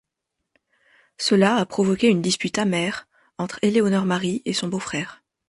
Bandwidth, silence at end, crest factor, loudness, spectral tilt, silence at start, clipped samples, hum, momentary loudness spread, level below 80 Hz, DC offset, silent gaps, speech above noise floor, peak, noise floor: 11.5 kHz; 0.35 s; 18 dB; -22 LUFS; -5 dB/octave; 1.2 s; under 0.1%; none; 11 LU; -62 dBFS; under 0.1%; none; 59 dB; -6 dBFS; -81 dBFS